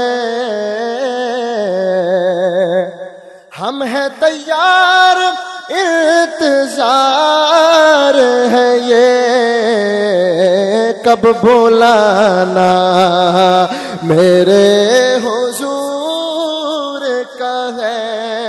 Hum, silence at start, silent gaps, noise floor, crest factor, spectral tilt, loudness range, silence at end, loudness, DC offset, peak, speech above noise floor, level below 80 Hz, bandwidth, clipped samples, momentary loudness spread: none; 0 s; none; -35 dBFS; 12 dB; -4 dB/octave; 6 LU; 0 s; -11 LUFS; under 0.1%; 0 dBFS; 25 dB; -58 dBFS; 12.5 kHz; 0.1%; 10 LU